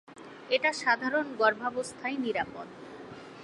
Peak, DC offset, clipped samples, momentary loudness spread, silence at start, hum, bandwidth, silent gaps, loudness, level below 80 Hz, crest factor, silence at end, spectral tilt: -10 dBFS; under 0.1%; under 0.1%; 20 LU; 0.1 s; none; 11.5 kHz; none; -29 LUFS; -70 dBFS; 22 dB; 0 s; -3 dB/octave